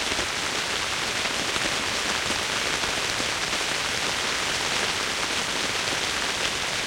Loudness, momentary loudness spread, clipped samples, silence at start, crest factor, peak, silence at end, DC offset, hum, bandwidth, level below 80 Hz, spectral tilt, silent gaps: -24 LUFS; 1 LU; under 0.1%; 0 s; 20 dB; -8 dBFS; 0 s; under 0.1%; none; 16.5 kHz; -50 dBFS; -1 dB/octave; none